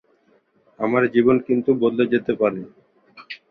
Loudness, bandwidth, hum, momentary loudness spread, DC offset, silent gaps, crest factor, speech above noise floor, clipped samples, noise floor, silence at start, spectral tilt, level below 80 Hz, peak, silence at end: -20 LUFS; 5.2 kHz; none; 16 LU; under 0.1%; none; 18 dB; 42 dB; under 0.1%; -61 dBFS; 0.8 s; -9.5 dB/octave; -62 dBFS; -4 dBFS; 0.15 s